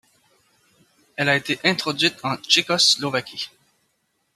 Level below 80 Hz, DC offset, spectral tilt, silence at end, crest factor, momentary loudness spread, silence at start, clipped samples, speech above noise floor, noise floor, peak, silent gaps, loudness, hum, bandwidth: -68 dBFS; under 0.1%; -2.5 dB/octave; 0.9 s; 22 dB; 16 LU; 1.2 s; under 0.1%; 49 dB; -70 dBFS; -2 dBFS; none; -19 LUFS; none; 14.5 kHz